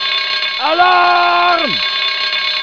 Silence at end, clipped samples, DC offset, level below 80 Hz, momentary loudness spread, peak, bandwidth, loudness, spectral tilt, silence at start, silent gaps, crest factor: 0 s; under 0.1%; 0.4%; -62 dBFS; 4 LU; 0 dBFS; 5.4 kHz; -12 LUFS; -2.5 dB/octave; 0 s; none; 14 dB